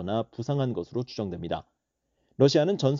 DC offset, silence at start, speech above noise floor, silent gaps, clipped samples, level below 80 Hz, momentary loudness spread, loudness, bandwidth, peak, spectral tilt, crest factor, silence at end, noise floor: under 0.1%; 0 s; 51 dB; none; under 0.1%; -60 dBFS; 13 LU; -27 LUFS; 7.4 kHz; -8 dBFS; -6.5 dB/octave; 20 dB; 0 s; -77 dBFS